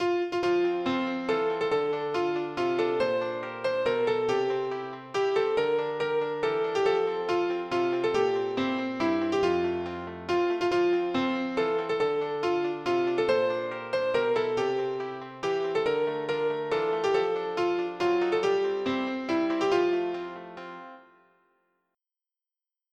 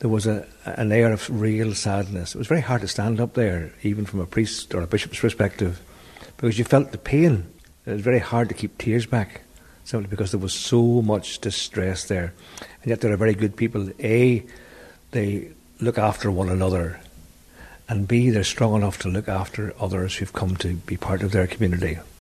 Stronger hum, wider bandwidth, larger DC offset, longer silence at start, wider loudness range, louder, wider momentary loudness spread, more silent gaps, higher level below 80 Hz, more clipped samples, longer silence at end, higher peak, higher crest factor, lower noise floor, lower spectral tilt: neither; second, 8.8 kHz vs 14 kHz; neither; about the same, 0 s vs 0 s; about the same, 2 LU vs 3 LU; second, -28 LUFS vs -23 LUFS; second, 6 LU vs 11 LU; neither; second, -66 dBFS vs -44 dBFS; neither; first, 1.9 s vs 0.15 s; second, -12 dBFS vs -4 dBFS; about the same, 16 dB vs 20 dB; first, under -90 dBFS vs -48 dBFS; about the same, -5.5 dB/octave vs -6 dB/octave